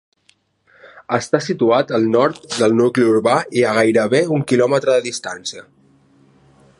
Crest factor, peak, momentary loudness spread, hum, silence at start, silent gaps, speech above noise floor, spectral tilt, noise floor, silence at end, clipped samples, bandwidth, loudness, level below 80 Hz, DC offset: 16 dB; 0 dBFS; 11 LU; none; 0.95 s; none; 43 dB; -5 dB/octave; -59 dBFS; 1.2 s; under 0.1%; 11.5 kHz; -16 LUFS; -64 dBFS; under 0.1%